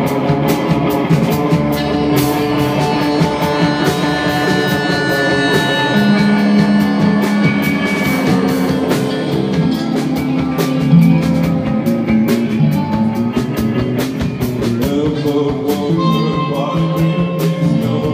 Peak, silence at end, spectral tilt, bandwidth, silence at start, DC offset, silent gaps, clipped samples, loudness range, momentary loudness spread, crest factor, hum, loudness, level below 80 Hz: 0 dBFS; 0 s; -6.5 dB/octave; 16 kHz; 0 s; under 0.1%; none; under 0.1%; 3 LU; 5 LU; 14 dB; none; -14 LUFS; -40 dBFS